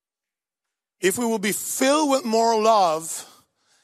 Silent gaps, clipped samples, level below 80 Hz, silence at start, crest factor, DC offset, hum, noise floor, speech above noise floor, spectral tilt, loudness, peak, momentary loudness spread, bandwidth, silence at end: none; under 0.1%; -74 dBFS; 1 s; 18 dB; under 0.1%; none; -89 dBFS; 69 dB; -3 dB/octave; -21 LUFS; -6 dBFS; 9 LU; 15.5 kHz; 0.6 s